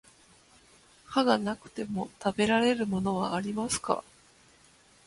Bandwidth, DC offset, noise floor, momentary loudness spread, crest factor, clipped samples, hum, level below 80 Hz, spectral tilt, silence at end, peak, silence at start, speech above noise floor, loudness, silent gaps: 11.5 kHz; under 0.1%; -60 dBFS; 10 LU; 22 dB; under 0.1%; none; -62 dBFS; -4.5 dB/octave; 1.05 s; -10 dBFS; 1.1 s; 32 dB; -29 LUFS; none